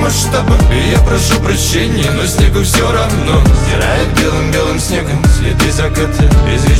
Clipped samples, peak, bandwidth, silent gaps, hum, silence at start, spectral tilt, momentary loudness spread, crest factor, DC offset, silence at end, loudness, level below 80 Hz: under 0.1%; 0 dBFS; 16.5 kHz; none; none; 0 s; -5 dB/octave; 3 LU; 10 dB; under 0.1%; 0 s; -11 LUFS; -14 dBFS